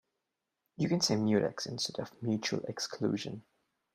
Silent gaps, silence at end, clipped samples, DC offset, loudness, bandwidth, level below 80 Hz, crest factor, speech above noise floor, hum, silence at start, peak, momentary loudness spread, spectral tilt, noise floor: none; 0.55 s; under 0.1%; under 0.1%; -33 LUFS; 15 kHz; -72 dBFS; 20 dB; 54 dB; none; 0.8 s; -16 dBFS; 9 LU; -4.5 dB/octave; -87 dBFS